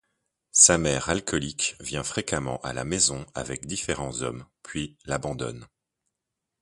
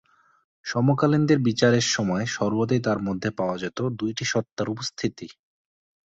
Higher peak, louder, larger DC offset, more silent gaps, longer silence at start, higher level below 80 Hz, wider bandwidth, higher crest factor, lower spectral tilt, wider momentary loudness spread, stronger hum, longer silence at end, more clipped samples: about the same, -2 dBFS vs -4 dBFS; about the same, -25 LUFS vs -24 LUFS; neither; second, none vs 4.52-4.56 s; about the same, 0.55 s vs 0.65 s; first, -48 dBFS vs -58 dBFS; first, 11.5 kHz vs 8.2 kHz; first, 26 dB vs 20 dB; second, -2.5 dB/octave vs -5 dB/octave; first, 18 LU vs 10 LU; neither; first, 0.95 s vs 0.8 s; neither